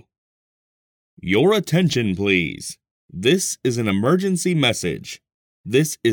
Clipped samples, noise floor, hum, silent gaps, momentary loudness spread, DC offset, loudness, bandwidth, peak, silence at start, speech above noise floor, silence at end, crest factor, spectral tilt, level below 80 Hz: under 0.1%; under -90 dBFS; none; 2.91-3.09 s, 5.34-5.64 s; 16 LU; under 0.1%; -19 LUFS; 19 kHz; -4 dBFS; 1.25 s; over 71 dB; 0 s; 18 dB; -4.5 dB/octave; -54 dBFS